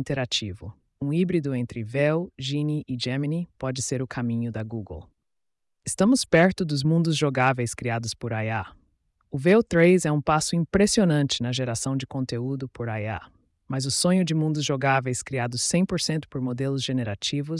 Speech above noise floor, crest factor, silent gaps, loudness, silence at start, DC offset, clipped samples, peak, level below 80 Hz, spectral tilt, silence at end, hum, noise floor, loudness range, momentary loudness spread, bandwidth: 55 dB; 16 dB; none; -25 LUFS; 0 s; under 0.1%; under 0.1%; -8 dBFS; -54 dBFS; -5 dB/octave; 0 s; none; -79 dBFS; 5 LU; 12 LU; 12 kHz